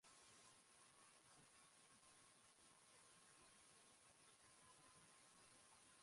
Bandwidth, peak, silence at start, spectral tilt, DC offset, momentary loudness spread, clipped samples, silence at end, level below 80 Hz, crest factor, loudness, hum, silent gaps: 11.5 kHz; -56 dBFS; 0 s; -1 dB/octave; under 0.1%; 2 LU; under 0.1%; 0 s; under -90 dBFS; 14 dB; -69 LUFS; none; none